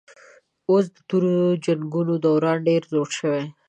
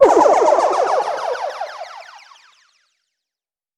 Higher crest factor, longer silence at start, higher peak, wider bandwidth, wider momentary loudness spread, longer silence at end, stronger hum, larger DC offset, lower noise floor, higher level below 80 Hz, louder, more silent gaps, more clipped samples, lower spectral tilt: about the same, 14 dB vs 18 dB; first, 0.7 s vs 0 s; second, -8 dBFS vs 0 dBFS; second, 9.2 kHz vs 11.5 kHz; second, 5 LU vs 21 LU; second, 0.2 s vs 1.75 s; neither; neither; second, -52 dBFS vs -89 dBFS; second, -72 dBFS vs -58 dBFS; second, -22 LUFS vs -16 LUFS; neither; neither; first, -7 dB/octave vs -3 dB/octave